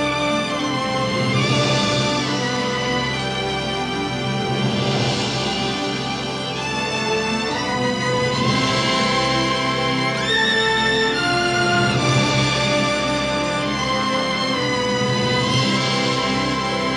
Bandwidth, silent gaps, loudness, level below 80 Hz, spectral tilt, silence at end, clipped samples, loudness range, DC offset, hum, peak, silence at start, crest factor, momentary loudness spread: 12 kHz; none; -19 LUFS; -44 dBFS; -4 dB/octave; 0 s; under 0.1%; 4 LU; under 0.1%; none; -6 dBFS; 0 s; 14 dB; 5 LU